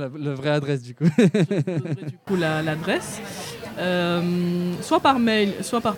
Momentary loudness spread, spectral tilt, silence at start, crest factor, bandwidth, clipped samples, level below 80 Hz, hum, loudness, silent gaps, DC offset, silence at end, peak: 12 LU; -6 dB/octave; 0 s; 18 dB; 18 kHz; under 0.1%; -58 dBFS; none; -23 LUFS; none; under 0.1%; 0 s; -4 dBFS